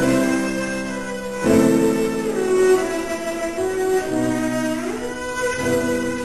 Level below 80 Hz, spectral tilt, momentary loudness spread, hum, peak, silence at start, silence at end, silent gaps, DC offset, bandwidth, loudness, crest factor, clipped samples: -46 dBFS; -5 dB/octave; 9 LU; none; -4 dBFS; 0 s; 0 s; none; 0.6%; 14 kHz; -21 LUFS; 16 dB; under 0.1%